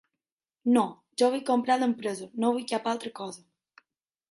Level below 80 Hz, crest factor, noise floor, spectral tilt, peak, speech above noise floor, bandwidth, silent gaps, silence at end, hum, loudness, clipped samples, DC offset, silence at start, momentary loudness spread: -78 dBFS; 18 dB; under -90 dBFS; -4.5 dB/octave; -12 dBFS; over 63 dB; 11.5 kHz; none; 0.95 s; none; -28 LUFS; under 0.1%; under 0.1%; 0.65 s; 13 LU